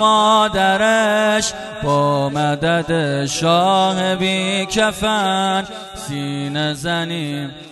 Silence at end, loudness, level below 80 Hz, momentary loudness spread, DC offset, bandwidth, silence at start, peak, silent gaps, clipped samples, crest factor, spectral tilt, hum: 0 s; -17 LUFS; -46 dBFS; 10 LU; under 0.1%; 12 kHz; 0 s; -2 dBFS; none; under 0.1%; 14 dB; -4 dB/octave; none